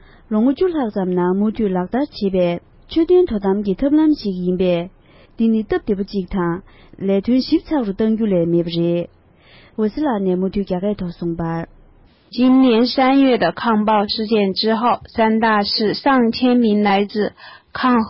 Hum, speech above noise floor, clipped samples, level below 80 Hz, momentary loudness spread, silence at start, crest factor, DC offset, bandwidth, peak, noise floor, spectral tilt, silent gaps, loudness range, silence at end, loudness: none; 32 dB; under 0.1%; -44 dBFS; 9 LU; 0.3 s; 12 dB; under 0.1%; 5.8 kHz; -6 dBFS; -49 dBFS; -10.5 dB/octave; none; 5 LU; 0 s; -18 LUFS